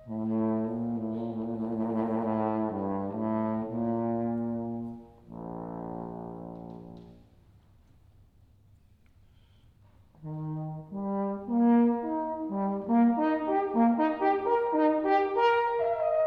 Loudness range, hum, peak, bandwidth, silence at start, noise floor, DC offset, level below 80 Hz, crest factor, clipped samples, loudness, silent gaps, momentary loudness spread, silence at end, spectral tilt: 17 LU; none; -14 dBFS; 5.4 kHz; 0 s; -59 dBFS; under 0.1%; -62 dBFS; 16 dB; under 0.1%; -29 LUFS; none; 17 LU; 0 s; -9.5 dB/octave